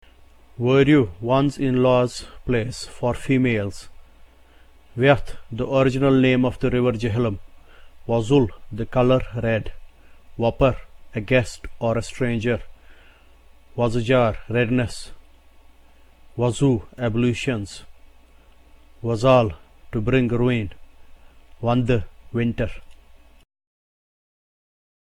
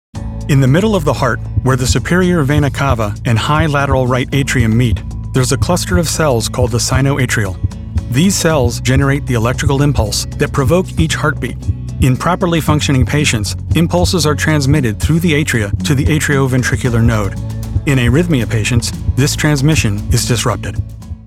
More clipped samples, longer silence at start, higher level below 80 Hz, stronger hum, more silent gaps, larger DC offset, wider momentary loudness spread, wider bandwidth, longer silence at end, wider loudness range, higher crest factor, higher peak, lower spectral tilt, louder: neither; first, 0.6 s vs 0.15 s; second, -40 dBFS vs -24 dBFS; neither; neither; neither; first, 15 LU vs 5 LU; second, 11.5 kHz vs 16 kHz; first, 2.05 s vs 0 s; first, 5 LU vs 1 LU; first, 20 dB vs 12 dB; about the same, -2 dBFS vs 0 dBFS; first, -7 dB/octave vs -5.5 dB/octave; second, -21 LUFS vs -14 LUFS